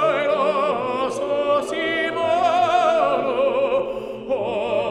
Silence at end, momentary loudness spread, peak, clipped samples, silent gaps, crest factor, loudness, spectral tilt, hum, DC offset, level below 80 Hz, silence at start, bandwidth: 0 s; 6 LU; -6 dBFS; under 0.1%; none; 14 dB; -21 LUFS; -4.5 dB/octave; none; under 0.1%; -56 dBFS; 0 s; 11 kHz